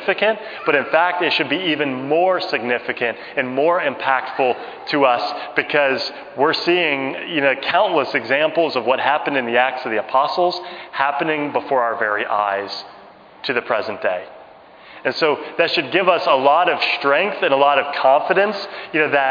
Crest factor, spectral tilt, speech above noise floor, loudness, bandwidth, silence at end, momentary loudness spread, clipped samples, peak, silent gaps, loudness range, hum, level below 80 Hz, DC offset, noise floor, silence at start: 18 dB; -5.5 dB/octave; 25 dB; -18 LUFS; 5.2 kHz; 0 s; 8 LU; under 0.1%; 0 dBFS; none; 5 LU; none; -70 dBFS; under 0.1%; -43 dBFS; 0 s